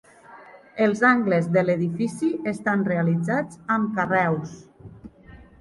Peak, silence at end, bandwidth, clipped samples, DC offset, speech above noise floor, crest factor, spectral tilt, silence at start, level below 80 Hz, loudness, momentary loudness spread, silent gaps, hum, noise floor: -6 dBFS; 0.25 s; 11.5 kHz; under 0.1%; under 0.1%; 25 dB; 18 dB; -7.5 dB/octave; 0.3 s; -58 dBFS; -23 LUFS; 7 LU; none; none; -48 dBFS